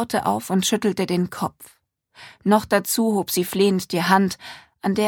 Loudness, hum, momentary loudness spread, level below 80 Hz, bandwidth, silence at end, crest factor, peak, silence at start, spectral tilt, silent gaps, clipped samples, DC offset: -21 LUFS; none; 10 LU; -58 dBFS; 18.5 kHz; 0 s; 20 dB; -2 dBFS; 0 s; -4.5 dB/octave; none; under 0.1%; under 0.1%